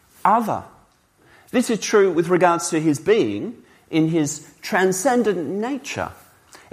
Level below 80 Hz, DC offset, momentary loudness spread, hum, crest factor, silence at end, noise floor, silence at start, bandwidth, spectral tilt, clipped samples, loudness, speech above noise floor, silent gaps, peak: -62 dBFS; under 0.1%; 11 LU; none; 18 dB; 0.15 s; -57 dBFS; 0.25 s; 15.5 kHz; -5 dB/octave; under 0.1%; -20 LUFS; 37 dB; none; -2 dBFS